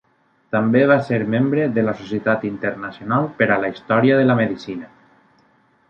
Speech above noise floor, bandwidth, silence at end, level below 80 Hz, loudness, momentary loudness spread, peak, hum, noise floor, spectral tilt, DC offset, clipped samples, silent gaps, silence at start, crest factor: 40 dB; 6.8 kHz; 1.05 s; -60 dBFS; -19 LUFS; 11 LU; -2 dBFS; none; -58 dBFS; -8.5 dB/octave; under 0.1%; under 0.1%; none; 0.5 s; 16 dB